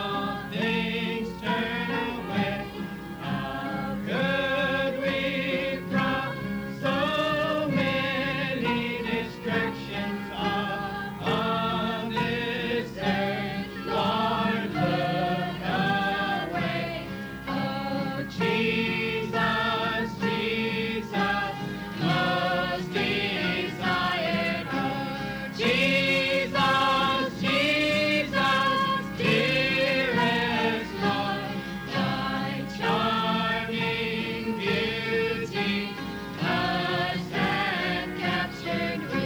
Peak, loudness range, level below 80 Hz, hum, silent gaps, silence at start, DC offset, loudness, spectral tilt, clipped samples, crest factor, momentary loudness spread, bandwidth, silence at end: -12 dBFS; 5 LU; -52 dBFS; none; none; 0 s; under 0.1%; -27 LUFS; -5.5 dB/octave; under 0.1%; 16 dB; 8 LU; over 20 kHz; 0 s